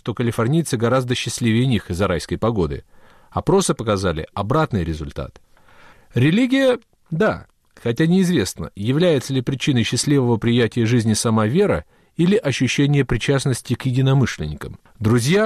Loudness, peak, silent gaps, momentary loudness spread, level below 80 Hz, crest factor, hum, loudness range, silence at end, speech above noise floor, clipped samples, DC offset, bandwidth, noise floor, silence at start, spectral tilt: -19 LUFS; -8 dBFS; none; 10 LU; -40 dBFS; 12 dB; none; 3 LU; 0 s; 29 dB; under 0.1%; under 0.1%; 14 kHz; -47 dBFS; 0.05 s; -6 dB/octave